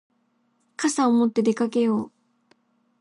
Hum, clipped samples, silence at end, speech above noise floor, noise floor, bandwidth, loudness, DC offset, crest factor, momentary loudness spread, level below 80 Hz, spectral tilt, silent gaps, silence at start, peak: none; under 0.1%; 0.95 s; 47 dB; -68 dBFS; 11.5 kHz; -22 LUFS; under 0.1%; 14 dB; 13 LU; -74 dBFS; -5 dB/octave; none; 0.8 s; -10 dBFS